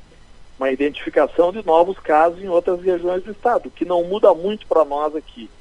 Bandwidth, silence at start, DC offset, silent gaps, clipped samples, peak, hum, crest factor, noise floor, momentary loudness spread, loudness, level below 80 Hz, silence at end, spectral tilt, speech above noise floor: 10.5 kHz; 0.4 s; under 0.1%; none; under 0.1%; -2 dBFS; none; 18 dB; -43 dBFS; 8 LU; -19 LUFS; -48 dBFS; 0.15 s; -6.5 dB/octave; 25 dB